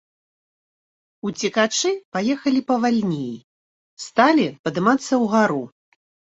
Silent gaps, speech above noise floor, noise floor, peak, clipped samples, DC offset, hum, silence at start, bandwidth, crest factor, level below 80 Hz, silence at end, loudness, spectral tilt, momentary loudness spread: 2.05-2.12 s, 3.44-3.97 s, 4.59-4.64 s; over 70 dB; under -90 dBFS; -2 dBFS; under 0.1%; under 0.1%; none; 1.25 s; 8 kHz; 20 dB; -66 dBFS; 0.7 s; -20 LUFS; -4.5 dB/octave; 14 LU